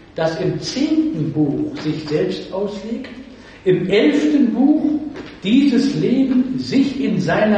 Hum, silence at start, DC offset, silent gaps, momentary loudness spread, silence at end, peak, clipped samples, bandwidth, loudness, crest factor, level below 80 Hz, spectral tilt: none; 0.15 s; under 0.1%; none; 10 LU; 0 s; -4 dBFS; under 0.1%; 8.6 kHz; -18 LUFS; 14 dB; -50 dBFS; -6.5 dB/octave